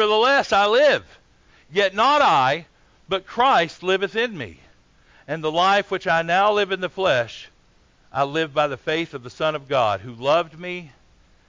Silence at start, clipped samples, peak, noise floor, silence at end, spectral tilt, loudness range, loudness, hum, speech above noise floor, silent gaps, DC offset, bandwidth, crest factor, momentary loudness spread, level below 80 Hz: 0 s; under 0.1%; -6 dBFS; -57 dBFS; 0.6 s; -4 dB/octave; 4 LU; -20 LUFS; none; 36 dB; none; under 0.1%; 7.6 kHz; 14 dB; 14 LU; -58 dBFS